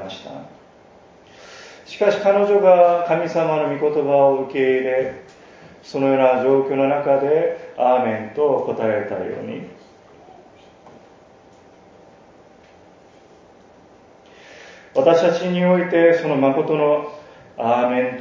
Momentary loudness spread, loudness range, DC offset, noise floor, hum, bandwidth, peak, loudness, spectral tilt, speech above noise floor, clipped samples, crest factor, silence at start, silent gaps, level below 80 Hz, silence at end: 19 LU; 9 LU; under 0.1%; -48 dBFS; none; 7.4 kHz; -2 dBFS; -18 LUFS; -7 dB/octave; 31 dB; under 0.1%; 18 dB; 0 s; none; -64 dBFS; 0 s